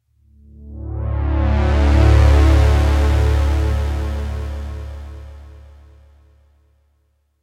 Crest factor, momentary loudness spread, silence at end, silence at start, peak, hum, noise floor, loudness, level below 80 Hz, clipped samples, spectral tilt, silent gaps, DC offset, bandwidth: 16 dB; 21 LU; 1.85 s; 0.6 s; -2 dBFS; none; -63 dBFS; -17 LUFS; -20 dBFS; under 0.1%; -7.5 dB/octave; none; under 0.1%; 8.6 kHz